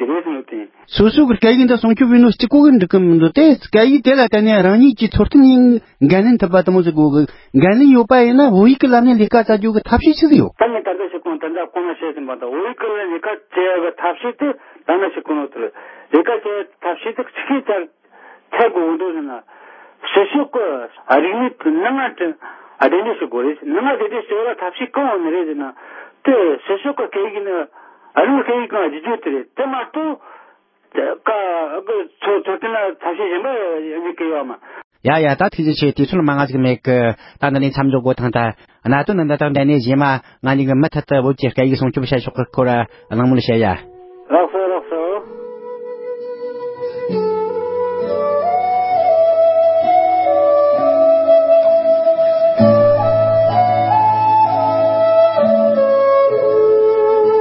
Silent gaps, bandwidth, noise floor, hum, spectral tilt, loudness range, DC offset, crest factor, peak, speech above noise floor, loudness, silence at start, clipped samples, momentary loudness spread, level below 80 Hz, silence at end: 34.84-34.91 s; 5.8 kHz; -52 dBFS; none; -10.5 dB/octave; 10 LU; under 0.1%; 14 dB; 0 dBFS; 38 dB; -15 LUFS; 0 s; under 0.1%; 13 LU; -44 dBFS; 0 s